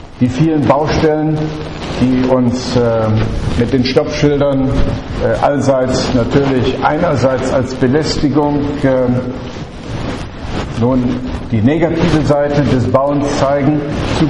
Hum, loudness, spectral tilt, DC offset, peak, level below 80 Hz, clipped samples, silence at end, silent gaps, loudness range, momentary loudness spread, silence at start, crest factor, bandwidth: none; -14 LUFS; -7 dB/octave; under 0.1%; 0 dBFS; -28 dBFS; under 0.1%; 0 s; none; 3 LU; 9 LU; 0 s; 14 dB; 10.5 kHz